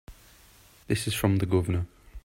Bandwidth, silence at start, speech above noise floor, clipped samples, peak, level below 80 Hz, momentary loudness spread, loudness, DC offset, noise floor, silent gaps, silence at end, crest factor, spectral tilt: 16 kHz; 0.1 s; 30 dB; under 0.1%; -8 dBFS; -48 dBFS; 7 LU; -27 LUFS; under 0.1%; -56 dBFS; none; 0.05 s; 20 dB; -6 dB/octave